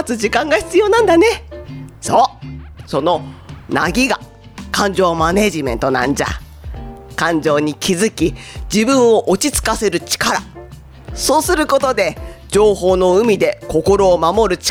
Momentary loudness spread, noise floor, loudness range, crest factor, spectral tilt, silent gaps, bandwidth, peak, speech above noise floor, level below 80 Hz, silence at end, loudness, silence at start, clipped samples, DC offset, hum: 19 LU; -36 dBFS; 4 LU; 14 dB; -4 dB/octave; none; over 20 kHz; -2 dBFS; 21 dB; -34 dBFS; 0 s; -15 LUFS; 0 s; under 0.1%; under 0.1%; none